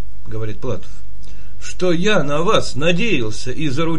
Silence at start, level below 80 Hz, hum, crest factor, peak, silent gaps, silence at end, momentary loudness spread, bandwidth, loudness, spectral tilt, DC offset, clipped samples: 0 s; -38 dBFS; 50 Hz at -40 dBFS; 20 dB; 0 dBFS; none; 0 s; 14 LU; 10.5 kHz; -20 LUFS; -5 dB/octave; 20%; under 0.1%